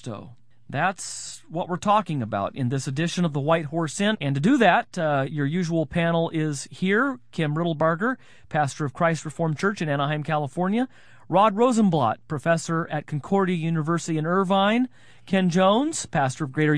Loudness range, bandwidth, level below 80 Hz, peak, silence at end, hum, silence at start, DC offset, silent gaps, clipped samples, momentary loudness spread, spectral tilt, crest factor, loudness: 3 LU; 11 kHz; -60 dBFS; -4 dBFS; 0 s; none; 0.05 s; 0.4%; none; under 0.1%; 9 LU; -5.5 dB/octave; 20 dB; -24 LUFS